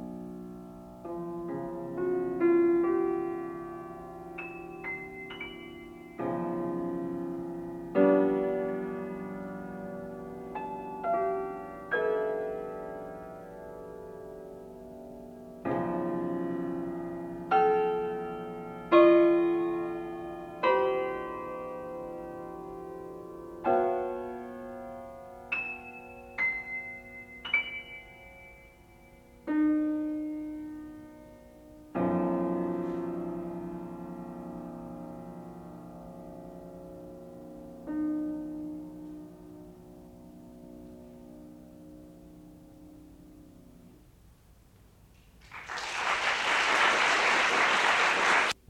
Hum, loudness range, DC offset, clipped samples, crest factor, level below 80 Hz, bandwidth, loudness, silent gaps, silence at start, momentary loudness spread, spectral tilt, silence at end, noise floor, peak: none; 17 LU; under 0.1%; under 0.1%; 22 dB; -62 dBFS; 13 kHz; -30 LUFS; none; 0 s; 23 LU; -4.5 dB/octave; 0.15 s; -58 dBFS; -10 dBFS